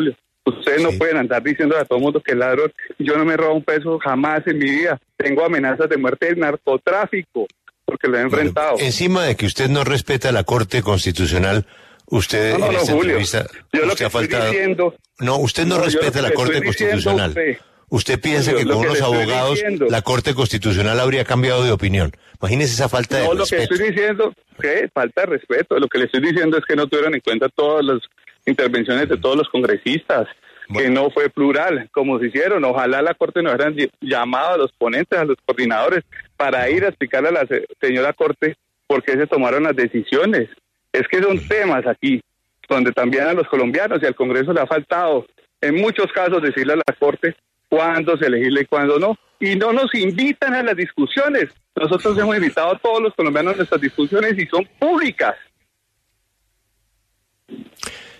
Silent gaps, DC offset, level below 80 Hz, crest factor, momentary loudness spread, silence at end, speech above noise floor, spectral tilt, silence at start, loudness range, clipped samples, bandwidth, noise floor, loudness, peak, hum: none; under 0.1%; -46 dBFS; 16 dB; 5 LU; 0.1 s; 52 dB; -5.5 dB/octave; 0 s; 1 LU; under 0.1%; 13.5 kHz; -69 dBFS; -18 LUFS; -2 dBFS; none